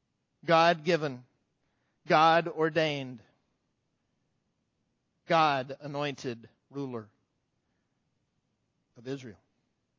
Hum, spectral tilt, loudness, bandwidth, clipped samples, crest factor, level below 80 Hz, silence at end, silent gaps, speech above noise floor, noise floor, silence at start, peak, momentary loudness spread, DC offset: none; -5.5 dB/octave; -27 LUFS; 7.6 kHz; under 0.1%; 22 dB; -78 dBFS; 0.65 s; none; 50 dB; -78 dBFS; 0.45 s; -10 dBFS; 20 LU; under 0.1%